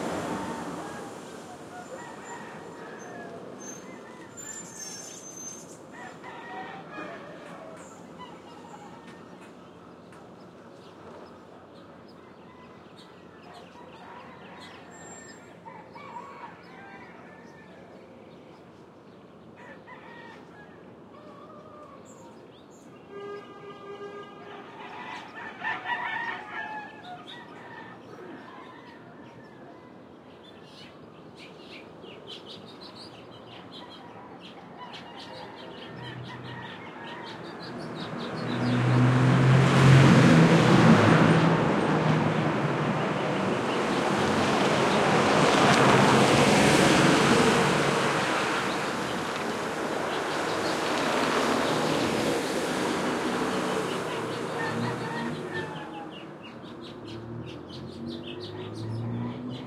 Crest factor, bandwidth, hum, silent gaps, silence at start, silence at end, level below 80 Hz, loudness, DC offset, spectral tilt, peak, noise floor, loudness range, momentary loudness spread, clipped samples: 22 dB; 14 kHz; none; none; 0 s; 0 s; -60 dBFS; -24 LUFS; under 0.1%; -5.5 dB/octave; -6 dBFS; -50 dBFS; 26 LU; 27 LU; under 0.1%